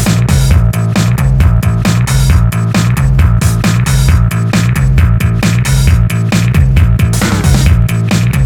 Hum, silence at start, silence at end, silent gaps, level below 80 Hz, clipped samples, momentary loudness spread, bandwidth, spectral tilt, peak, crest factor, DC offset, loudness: none; 0 s; 0 s; none; -14 dBFS; 0.2%; 2 LU; 18 kHz; -6 dB/octave; 0 dBFS; 8 dB; under 0.1%; -10 LUFS